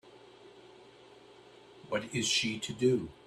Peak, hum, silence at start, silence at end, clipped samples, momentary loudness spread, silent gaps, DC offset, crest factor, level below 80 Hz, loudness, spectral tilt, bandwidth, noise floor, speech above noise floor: -16 dBFS; none; 0.05 s; 0.15 s; under 0.1%; 8 LU; none; under 0.1%; 20 dB; -68 dBFS; -31 LUFS; -3.5 dB/octave; 13.5 kHz; -56 dBFS; 24 dB